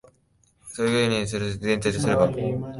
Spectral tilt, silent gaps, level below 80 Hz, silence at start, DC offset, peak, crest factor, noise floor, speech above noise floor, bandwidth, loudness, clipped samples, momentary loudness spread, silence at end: -5.5 dB/octave; none; -50 dBFS; 0.65 s; under 0.1%; -6 dBFS; 18 dB; -64 dBFS; 40 dB; 11.5 kHz; -24 LUFS; under 0.1%; 7 LU; 0 s